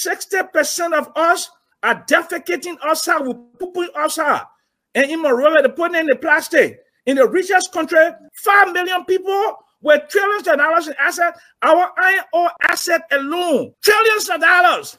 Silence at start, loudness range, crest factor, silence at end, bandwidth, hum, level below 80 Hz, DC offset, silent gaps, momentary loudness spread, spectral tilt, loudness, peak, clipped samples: 0 s; 4 LU; 16 dB; 0.05 s; 16 kHz; none; -70 dBFS; under 0.1%; none; 9 LU; -1.5 dB/octave; -16 LUFS; 0 dBFS; under 0.1%